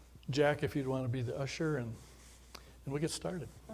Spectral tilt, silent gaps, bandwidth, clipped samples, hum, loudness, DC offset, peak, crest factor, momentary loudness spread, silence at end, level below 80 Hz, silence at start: -5.5 dB/octave; none; 16 kHz; under 0.1%; none; -36 LUFS; under 0.1%; -18 dBFS; 20 dB; 22 LU; 0 s; -58 dBFS; 0 s